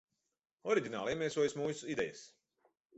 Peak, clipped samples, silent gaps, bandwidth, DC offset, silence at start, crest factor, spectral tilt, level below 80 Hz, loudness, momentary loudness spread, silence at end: -18 dBFS; under 0.1%; none; 8 kHz; under 0.1%; 0.65 s; 20 dB; -4 dB/octave; -72 dBFS; -37 LUFS; 8 LU; 0.7 s